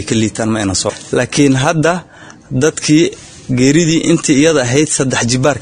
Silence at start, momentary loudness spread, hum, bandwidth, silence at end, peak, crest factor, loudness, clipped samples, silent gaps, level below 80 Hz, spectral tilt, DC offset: 0 s; 7 LU; none; 10.5 kHz; 0 s; 0 dBFS; 12 dB; -13 LUFS; 0.1%; none; -40 dBFS; -4.5 dB/octave; under 0.1%